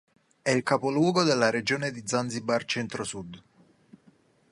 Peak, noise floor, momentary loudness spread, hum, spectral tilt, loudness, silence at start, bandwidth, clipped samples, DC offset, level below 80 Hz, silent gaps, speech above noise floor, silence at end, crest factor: -6 dBFS; -62 dBFS; 11 LU; none; -4.5 dB/octave; -27 LUFS; 0.45 s; 11.5 kHz; under 0.1%; under 0.1%; -66 dBFS; none; 35 dB; 1.15 s; 22 dB